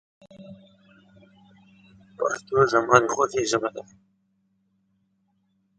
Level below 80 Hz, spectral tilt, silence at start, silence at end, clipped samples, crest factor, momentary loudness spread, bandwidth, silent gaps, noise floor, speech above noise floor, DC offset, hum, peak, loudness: -62 dBFS; -4 dB/octave; 0.4 s; 1.95 s; under 0.1%; 26 dB; 12 LU; 9.4 kHz; none; -70 dBFS; 47 dB; under 0.1%; none; 0 dBFS; -22 LUFS